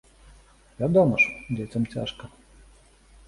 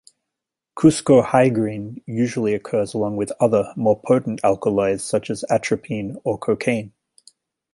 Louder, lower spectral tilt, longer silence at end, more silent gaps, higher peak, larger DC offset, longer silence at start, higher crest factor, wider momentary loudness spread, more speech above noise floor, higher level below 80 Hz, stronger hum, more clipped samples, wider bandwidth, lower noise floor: second, -24 LUFS vs -20 LUFS; about the same, -7 dB/octave vs -6 dB/octave; first, 1 s vs 0.85 s; neither; second, -8 dBFS vs -2 dBFS; neither; about the same, 0.8 s vs 0.75 s; about the same, 20 dB vs 18 dB; first, 14 LU vs 10 LU; second, 31 dB vs 65 dB; about the same, -52 dBFS vs -56 dBFS; neither; neither; about the same, 11.5 kHz vs 11.5 kHz; second, -54 dBFS vs -84 dBFS